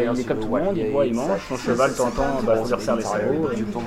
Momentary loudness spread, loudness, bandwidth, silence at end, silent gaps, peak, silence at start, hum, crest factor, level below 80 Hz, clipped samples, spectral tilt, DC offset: 4 LU; -22 LUFS; 15.5 kHz; 0 s; none; -8 dBFS; 0 s; none; 14 dB; -40 dBFS; under 0.1%; -6 dB/octave; under 0.1%